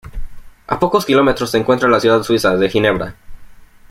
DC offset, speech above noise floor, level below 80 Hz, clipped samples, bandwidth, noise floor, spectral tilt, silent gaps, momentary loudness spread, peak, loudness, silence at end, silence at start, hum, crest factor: under 0.1%; 23 dB; -36 dBFS; under 0.1%; 16 kHz; -37 dBFS; -5.5 dB/octave; none; 10 LU; -2 dBFS; -14 LUFS; 0.35 s; 0.05 s; none; 14 dB